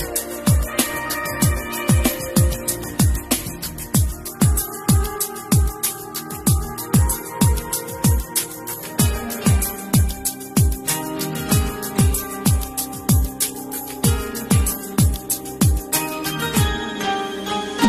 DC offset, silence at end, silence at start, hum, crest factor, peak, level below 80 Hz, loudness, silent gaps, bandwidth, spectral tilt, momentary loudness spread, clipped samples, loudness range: under 0.1%; 0 s; 0 s; none; 16 dB; -4 dBFS; -26 dBFS; -20 LUFS; none; 15 kHz; -4.5 dB/octave; 6 LU; under 0.1%; 1 LU